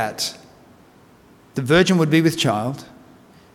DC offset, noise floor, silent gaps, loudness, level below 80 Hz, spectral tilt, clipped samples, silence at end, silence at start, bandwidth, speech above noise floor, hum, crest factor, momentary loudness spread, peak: under 0.1%; -50 dBFS; none; -19 LUFS; -52 dBFS; -5 dB/octave; under 0.1%; 0.7 s; 0 s; 17 kHz; 32 dB; none; 18 dB; 14 LU; -4 dBFS